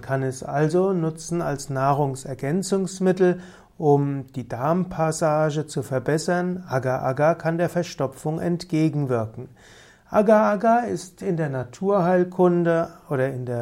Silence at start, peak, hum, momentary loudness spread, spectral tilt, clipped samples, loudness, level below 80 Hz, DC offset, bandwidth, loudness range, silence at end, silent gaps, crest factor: 0 s; -6 dBFS; none; 8 LU; -7 dB/octave; under 0.1%; -23 LUFS; -56 dBFS; under 0.1%; 15.5 kHz; 3 LU; 0 s; none; 18 dB